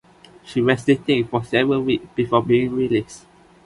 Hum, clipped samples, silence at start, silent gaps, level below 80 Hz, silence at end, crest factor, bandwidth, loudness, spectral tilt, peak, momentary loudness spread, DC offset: none; under 0.1%; 0.45 s; none; -52 dBFS; 0.5 s; 18 dB; 11.5 kHz; -20 LUFS; -6.5 dB/octave; -2 dBFS; 5 LU; under 0.1%